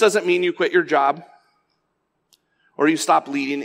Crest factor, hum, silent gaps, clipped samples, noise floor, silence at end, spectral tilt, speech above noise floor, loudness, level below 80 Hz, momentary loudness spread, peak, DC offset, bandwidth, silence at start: 16 dB; none; none; under 0.1%; -72 dBFS; 0 s; -3.5 dB/octave; 53 dB; -19 LUFS; -80 dBFS; 6 LU; -4 dBFS; under 0.1%; 16 kHz; 0 s